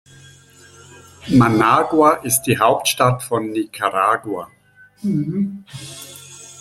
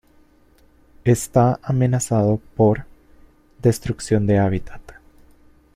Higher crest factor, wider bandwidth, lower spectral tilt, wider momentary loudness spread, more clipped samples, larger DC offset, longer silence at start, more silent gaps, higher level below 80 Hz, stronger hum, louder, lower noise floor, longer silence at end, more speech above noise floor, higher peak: about the same, 18 dB vs 18 dB; about the same, 16 kHz vs 15.5 kHz; second, -4.5 dB/octave vs -7 dB/octave; first, 20 LU vs 7 LU; neither; neither; first, 1.25 s vs 1.05 s; neither; second, -52 dBFS vs -44 dBFS; neither; first, -17 LUFS vs -20 LUFS; second, -46 dBFS vs -54 dBFS; second, 0 s vs 0.85 s; second, 29 dB vs 36 dB; about the same, 0 dBFS vs -2 dBFS